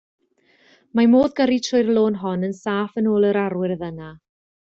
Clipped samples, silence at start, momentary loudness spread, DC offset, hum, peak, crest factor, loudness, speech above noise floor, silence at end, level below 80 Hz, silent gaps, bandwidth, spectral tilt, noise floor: under 0.1%; 0.95 s; 12 LU; under 0.1%; none; -6 dBFS; 16 dB; -20 LUFS; 40 dB; 0.55 s; -58 dBFS; none; 7.6 kHz; -6 dB/octave; -59 dBFS